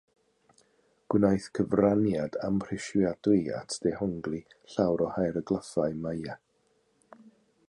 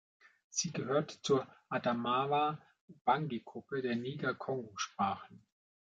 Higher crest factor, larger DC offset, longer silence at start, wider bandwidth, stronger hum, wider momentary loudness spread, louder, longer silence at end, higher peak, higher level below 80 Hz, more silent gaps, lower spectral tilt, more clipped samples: about the same, 20 dB vs 20 dB; neither; first, 1.1 s vs 0.55 s; first, 11 kHz vs 9 kHz; neither; first, 11 LU vs 8 LU; first, -29 LUFS vs -36 LUFS; second, 0.4 s vs 0.55 s; first, -10 dBFS vs -18 dBFS; first, -58 dBFS vs -76 dBFS; second, none vs 2.81-2.88 s, 3.01-3.05 s; first, -7 dB/octave vs -4.5 dB/octave; neither